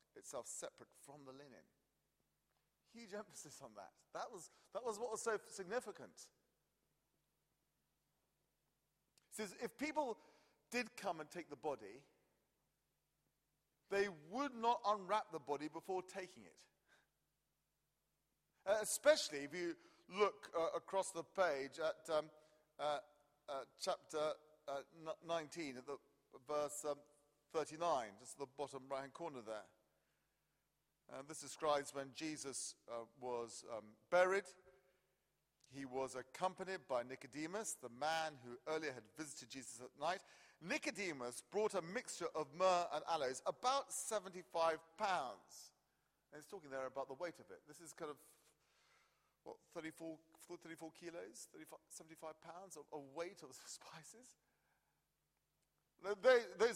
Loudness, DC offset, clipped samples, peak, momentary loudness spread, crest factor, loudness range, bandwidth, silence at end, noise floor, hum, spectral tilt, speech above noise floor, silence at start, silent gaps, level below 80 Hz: -44 LUFS; under 0.1%; under 0.1%; -20 dBFS; 18 LU; 26 dB; 14 LU; 16 kHz; 0 s; -88 dBFS; none; -3 dB/octave; 43 dB; 0.15 s; none; -86 dBFS